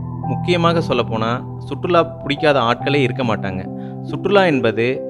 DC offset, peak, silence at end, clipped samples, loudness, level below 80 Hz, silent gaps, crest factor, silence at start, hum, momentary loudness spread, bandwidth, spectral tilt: under 0.1%; 0 dBFS; 0 s; under 0.1%; -18 LUFS; -48 dBFS; none; 18 dB; 0 s; none; 11 LU; 11 kHz; -7 dB/octave